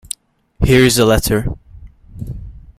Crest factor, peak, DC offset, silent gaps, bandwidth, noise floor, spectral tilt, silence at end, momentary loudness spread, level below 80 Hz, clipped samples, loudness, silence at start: 16 dB; 0 dBFS; under 0.1%; none; 16 kHz; -39 dBFS; -5 dB/octave; 0.2 s; 22 LU; -28 dBFS; under 0.1%; -13 LUFS; 0.6 s